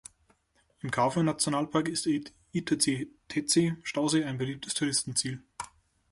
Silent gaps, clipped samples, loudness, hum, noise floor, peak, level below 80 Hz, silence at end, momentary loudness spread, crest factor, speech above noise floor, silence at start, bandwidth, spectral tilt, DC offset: none; under 0.1%; -29 LUFS; none; -70 dBFS; -10 dBFS; -64 dBFS; 0.45 s; 10 LU; 20 dB; 40 dB; 0.85 s; 11.5 kHz; -4 dB/octave; under 0.1%